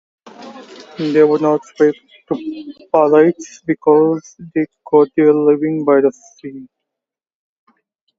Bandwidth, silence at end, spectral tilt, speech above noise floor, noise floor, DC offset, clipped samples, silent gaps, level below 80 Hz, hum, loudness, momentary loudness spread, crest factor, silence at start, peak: 7.6 kHz; 1.55 s; -7 dB/octave; 69 dB; -84 dBFS; under 0.1%; under 0.1%; none; -64 dBFS; none; -15 LUFS; 21 LU; 16 dB; 0.25 s; 0 dBFS